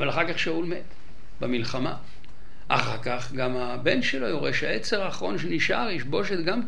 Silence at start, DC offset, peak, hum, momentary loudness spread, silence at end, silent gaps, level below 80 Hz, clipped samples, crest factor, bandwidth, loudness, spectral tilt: 0 s; 4%; -2 dBFS; none; 6 LU; 0 s; none; -52 dBFS; under 0.1%; 26 dB; 11.5 kHz; -27 LUFS; -5 dB/octave